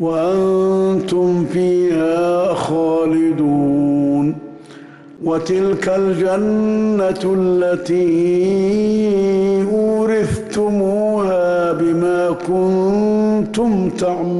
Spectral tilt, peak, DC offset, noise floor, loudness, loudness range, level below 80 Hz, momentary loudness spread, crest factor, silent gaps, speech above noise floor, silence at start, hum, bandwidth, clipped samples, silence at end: -7.5 dB/octave; -8 dBFS; under 0.1%; -38 dBFS; -16 LUFS; 2 LU; -48 dBFS; 3 LU; 6 dB; none; 23 dB; 0 s; none; 11.5 kHz; under 0.1%; 0 s